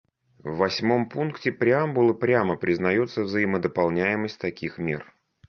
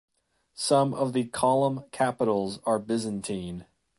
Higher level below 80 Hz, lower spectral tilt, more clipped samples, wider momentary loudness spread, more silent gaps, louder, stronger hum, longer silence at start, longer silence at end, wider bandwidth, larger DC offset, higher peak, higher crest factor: first, -56 dBFS vs -62 dBFS; first, -7 dB/octave vs -5 dB/octave; neither; about the same, 9 LU vs 10 LU; neither; first, -24 LUFS vs -27 LUFS; neither; about the same, 0.45 s vs 0.55 s; about the same, 0.45 s vs 0.35 s; second, 6.6 kHz vs 11.5 kHz; neither; about the same, -8 dBFS vs -8 dBFS; about the same, 18 dB vs 18 dB